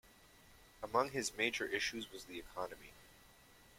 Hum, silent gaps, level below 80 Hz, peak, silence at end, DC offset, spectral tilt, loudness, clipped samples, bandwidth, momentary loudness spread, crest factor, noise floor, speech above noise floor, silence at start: none; none; -68 dBFS; -18 dBFS; 0.05 s; under 0.1%; -2.5 dB/octave; -39 LUFS; under 0.1%; 16.5 kHz; 18 LU; 24 dB; -64 dBFS; 23 dB; 0.05 s